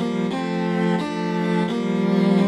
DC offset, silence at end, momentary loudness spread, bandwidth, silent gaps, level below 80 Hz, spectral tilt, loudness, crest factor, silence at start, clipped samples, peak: under 0.1%; 0 s; 5 LU; 10 kHz; none; -60 dBFS; -7.5 dB/octave; -22 LUFS; 14 dB; 0 s; under 0.1%; -6 dBFS